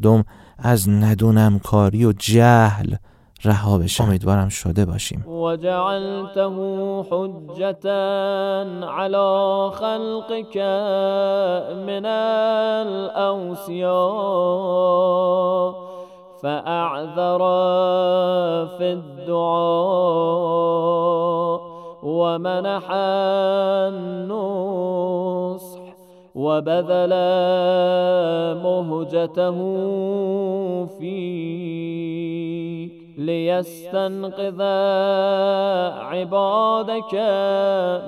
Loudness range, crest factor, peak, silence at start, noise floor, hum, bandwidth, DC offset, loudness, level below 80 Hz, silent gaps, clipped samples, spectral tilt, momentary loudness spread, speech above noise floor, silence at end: 6 LU; 20 dB; 0 dBFS; 0 s; -45 dBFS; none; 16 kHz; under 0.1%; -20 LUFS; -50 dBFS; none; under 0.1%; -6.5 dB/octave; 10 LU; 26 dB; 0 s